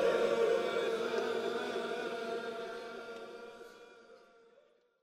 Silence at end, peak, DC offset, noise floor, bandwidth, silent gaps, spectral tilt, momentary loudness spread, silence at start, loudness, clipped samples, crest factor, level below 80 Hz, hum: 0.85 s; -20 dBFS; under 0.1%; -68 dBFS; 15 kHz; none; -4 dB/octave; 21 LU; 0 s; -36 LUFS; under 0.1%; 16 dB; -80 dBFS; none